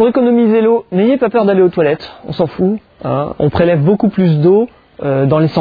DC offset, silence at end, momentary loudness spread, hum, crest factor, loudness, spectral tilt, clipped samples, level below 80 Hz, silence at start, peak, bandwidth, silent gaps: under 0.1%; 0 s; 9 LU; none; 12 dB; -13 LUFS; -10.5 dB/octave; under 0.1%; -44 dBFS; 0 s; 0 dBFS; 5 kHz; none